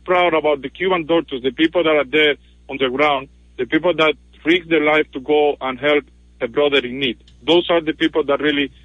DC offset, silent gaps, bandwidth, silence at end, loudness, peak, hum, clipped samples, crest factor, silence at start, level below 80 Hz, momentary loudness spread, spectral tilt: under 0.1%; none; 8 kHz; 0.15 s; -18 LUFS; -2 dBFS; none; under 0.1%; 16 dB; 0.05 s; -48 dBFS; 8 LU; -6 dB/octave